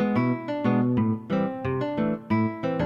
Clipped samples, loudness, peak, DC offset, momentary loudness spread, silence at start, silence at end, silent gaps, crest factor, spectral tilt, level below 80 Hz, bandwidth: under 0.1%; -26 LUFS; -10 dBFS; under 0.1%; 5 LU; 0 s; 0 s; none; 14 dB; -9.5 dB/octave; -58 dBFS; 6.2 kHz